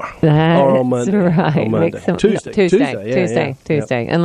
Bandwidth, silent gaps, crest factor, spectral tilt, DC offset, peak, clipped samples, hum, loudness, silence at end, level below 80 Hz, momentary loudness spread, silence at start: 10.5 kHz; none; 14 dB; -7.5 dB/octave; under 0.1%; -2 dBFS; under 0.1%; none; -15 LUFS; 0 s; -46 dBFS; 6 LU; 0 s